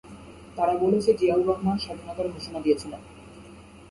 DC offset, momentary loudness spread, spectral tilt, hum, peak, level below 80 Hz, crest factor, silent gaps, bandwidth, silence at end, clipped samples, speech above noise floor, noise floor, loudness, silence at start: under 0.1%; 24 LU; -6.5 dB/octave; none; -8 dBFS; -52 dBFS; 18 dB; none; 11.5 kHz; 0.05 s; under 0.1%; 22 dB; -47 dBFS; -25 LUFS; 0.05 s